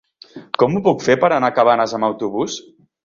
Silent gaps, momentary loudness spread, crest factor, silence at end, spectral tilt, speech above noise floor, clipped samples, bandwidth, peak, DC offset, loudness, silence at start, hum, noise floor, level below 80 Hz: none; 10 LU; 16 dB; 0.45 s; -5.5 dB/octave; 24 dB; under 0.1%; 7.4 kHz; -2 dBFS; under 0.1%; -17 LUFS; 0.35 s; none; -40 dBFS; -58 dBFS